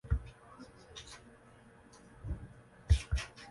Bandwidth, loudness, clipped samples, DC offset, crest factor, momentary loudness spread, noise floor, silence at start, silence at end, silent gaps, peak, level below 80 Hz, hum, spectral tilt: 11.5 kHz; -38 LUFS; under 0.1%; under 0.1%; 24 dB; 26 LU; -59 dBFS; 0.05 s; 0 s; none; -14 dBFS; -40 dBFS; none; -5 dB/octave